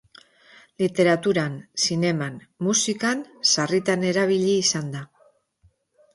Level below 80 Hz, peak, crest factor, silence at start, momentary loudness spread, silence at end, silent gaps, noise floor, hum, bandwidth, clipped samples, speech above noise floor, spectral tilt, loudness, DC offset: -66 dBFS; -6 dBFS; 18 dB; 0.8 s; 9 LU; 1.1 s; none; -63 dBFS; none; 11.5 kHz; under 0.1%; 40 dB; -3.5 dB/octave; -22 LUFS; under 0.1%